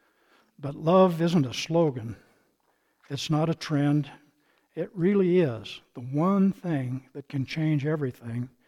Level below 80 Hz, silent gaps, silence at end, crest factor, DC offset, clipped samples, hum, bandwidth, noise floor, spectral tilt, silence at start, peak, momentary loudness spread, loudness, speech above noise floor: -66 dBFS; none; 0.2 s; 18 dB; under 0.1%; under 0.1%; none; 13.5 kHz; -71 dBFS; -7 dB/octave; 0.6 s; -10 dBFS; 16 LU; -26 LUFS; 45 dB